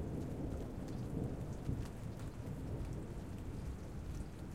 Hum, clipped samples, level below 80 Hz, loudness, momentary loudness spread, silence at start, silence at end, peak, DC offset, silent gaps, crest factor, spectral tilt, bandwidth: none; under 0.1%; -50 dBFS; -45 LUFS; 5 LU; 0 s; 0 s; -24 dBFS; 0.1%; none; 18 dB; -7.5 dB/octave; 16.5 kHz